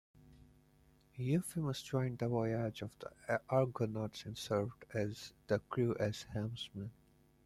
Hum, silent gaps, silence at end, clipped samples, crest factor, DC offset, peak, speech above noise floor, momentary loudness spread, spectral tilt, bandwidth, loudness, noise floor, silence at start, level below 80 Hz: none; none; 0.55 s; under 0.1%; 20 dB; under 0.1%; -18 dBFS; 30 dB; 12 LU; -6.5 dB/octave; 14.5 kHz; -39 LUFS; -68 dBFS; 0.25 s; -66 dBFS